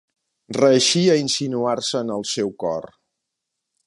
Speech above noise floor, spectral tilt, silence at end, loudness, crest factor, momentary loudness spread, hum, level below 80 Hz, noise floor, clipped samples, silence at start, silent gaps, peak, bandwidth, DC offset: 61 dB; -4 dB/octave; 1 s; -20 LUFS; 18 dB; 11 LU; none; -66 dBFS; -81 dBFS; under 0.1%; 0.5 s; none; -4 dBFS; 11.5 kHz; under 0.1%